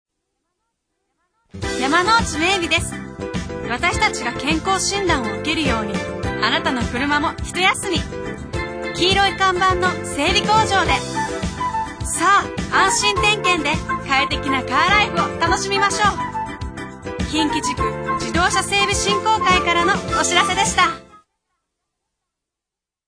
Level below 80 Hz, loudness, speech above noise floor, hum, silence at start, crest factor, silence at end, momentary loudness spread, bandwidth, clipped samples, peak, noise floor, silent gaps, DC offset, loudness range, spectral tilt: -36 dBFS; -18 LUFS; 68 dB; none; 1.55 s; 18 dB; 1.9 s; 11 LU; 10.5 kHz; under 0.1%; -2 dBFS; -87 dBFS; none; under 0.1%; 3 LU; -3 dB/octave